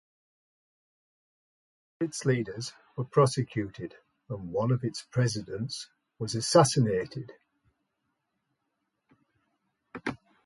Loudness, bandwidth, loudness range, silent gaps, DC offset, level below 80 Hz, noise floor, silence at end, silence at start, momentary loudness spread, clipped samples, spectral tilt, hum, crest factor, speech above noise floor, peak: -29 LUFS; 11.5 kHz; 8 LU; none; under 0.1%; -64 dBFS; -81 dBFS; 0.3 s; 2 s; 18 LU; under 0.1%; -5.5 dB/octave; none; 24 dB; 52 dB; -8 dBFS